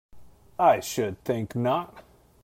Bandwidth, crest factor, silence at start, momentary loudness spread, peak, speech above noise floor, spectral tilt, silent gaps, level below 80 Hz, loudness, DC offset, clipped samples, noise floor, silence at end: 16 kHz; 20 dB; 0.15 s; 13 LU; -8 dBFS; 23 dB; -5.5 dB/octave; none; -60 dBFS; -26 LUFS; under 0.1%; under 0.1%; -48 dBFS; 0.45 s